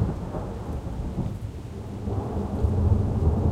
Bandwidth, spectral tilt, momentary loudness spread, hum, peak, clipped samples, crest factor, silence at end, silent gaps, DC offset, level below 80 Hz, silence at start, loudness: 9.6 kHz; -9.5 dB/octave; 12 LU; none; -10 dBFS; under 0.1%; 16 dB; 0 s; none; under 0.1%; -34 dBFS; 0 s; -28 LUFS